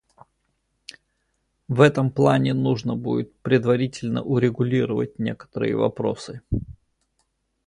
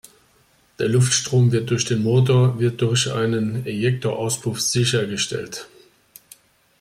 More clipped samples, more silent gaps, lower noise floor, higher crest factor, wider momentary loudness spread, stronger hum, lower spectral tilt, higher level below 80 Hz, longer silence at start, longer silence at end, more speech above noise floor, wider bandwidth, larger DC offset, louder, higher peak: neither; neither; first, -72 dBFS vs -58 dBFS; first, 20 dB vs 14 dB; first, 12 LU vs 7 LU; neither; first, -7.5 dB/octave vs -5 dB/octave; first, -46 dBFS vs -56 dBFS; first, 1.7 s vs 0.8 s; second, 0.95 s vs 1.15 s; first, 51 dB vs 39 dB; second, 11 kHz vs 15 kHz; neither; about the same, -22 LUFS vs -20 LUFS; first, -2 dBFS vs -6 dBFS